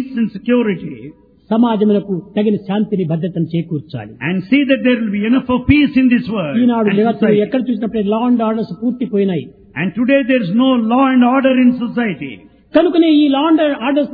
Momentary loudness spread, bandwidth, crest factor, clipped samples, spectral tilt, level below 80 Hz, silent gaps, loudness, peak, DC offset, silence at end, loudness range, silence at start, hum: 9 LU; 4.9 kHz; 14 dB; under 0.1%; -10.5 dB/octave; -44 dBFS; none; -15 LUFS; 0 dBFS; under 0.1%; 0 s; 4 LU; 0 s; none